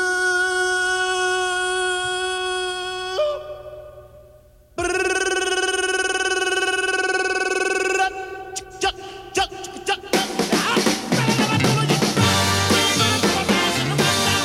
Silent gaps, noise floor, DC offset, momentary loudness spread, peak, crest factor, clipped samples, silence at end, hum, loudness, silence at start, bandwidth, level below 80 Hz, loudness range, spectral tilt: none; -50 dBFS; under 0.1%; 9 LU; -4 dBFS; 16 dB; under 0.1%; 0 s; none; -20 LUFS; 0 s; 16.5 kHz; -50 dBFS; 7 LU; -3 dB/octave